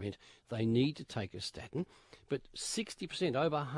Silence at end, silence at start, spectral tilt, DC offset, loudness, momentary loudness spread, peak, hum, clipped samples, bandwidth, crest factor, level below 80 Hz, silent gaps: 0 s; 0 s; -5 dB/octave; under 0.1%; -37 LUFS; 12 LU; -18 dBFS; none; under 0.1%; 11.5 kHz; 18 dB; -66 dBFS; none